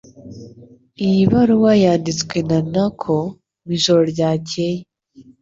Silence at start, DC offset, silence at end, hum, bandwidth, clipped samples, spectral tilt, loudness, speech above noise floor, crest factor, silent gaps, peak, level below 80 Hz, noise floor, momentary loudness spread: 0.2 s; under 0.1%; 0.2 s; none; 7.8 kHz; under 0.1%; -6 dB/octave; -17 LUFS; 31 dB; 16 dB; none; -2 dBFS; -50 dBFS; -47 dBFS; 12 LU